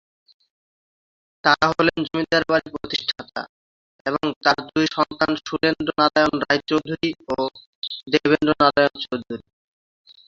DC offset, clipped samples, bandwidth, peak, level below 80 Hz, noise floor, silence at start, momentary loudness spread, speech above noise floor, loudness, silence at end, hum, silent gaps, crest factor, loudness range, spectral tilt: under 0.1%; under 0.1%; 7.6 kHz; -2 dBFS; -54 dBFS; under -90 dBFS; 1.45 s; 13 LU; over 69 dB; -21 LUFS; 0.9 s; none; 3.49-4.05 s, 4.36-4.41 s, 7.66-7.82 s; 22 dB; 2 LU; -5 dB/octave